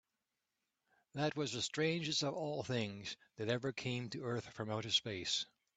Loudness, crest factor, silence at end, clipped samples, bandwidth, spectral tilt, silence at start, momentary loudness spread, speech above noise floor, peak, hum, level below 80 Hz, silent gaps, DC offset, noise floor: -39 LUFS; 20 dB; 0.3 s; under 0.1%; 9 kHz; -4 dB/octave; 1.15 s; 8 LU; 49 dB; -20 dBFS; none; -76 dBFS; none; under 0.1%; -89 dBFS